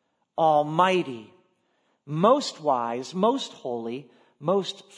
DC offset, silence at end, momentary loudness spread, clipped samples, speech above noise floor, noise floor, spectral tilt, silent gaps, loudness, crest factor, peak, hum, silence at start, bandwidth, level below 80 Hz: under 0.1%; 0.15 s; 14 LU; under 0.1%; 46 dB; -70 dBFS; -5.5 dB/octave; none; -25 LUFS; 20 dB; -6 dBFS; none; 0.4 s; 10.5 kHz; -80 dBFS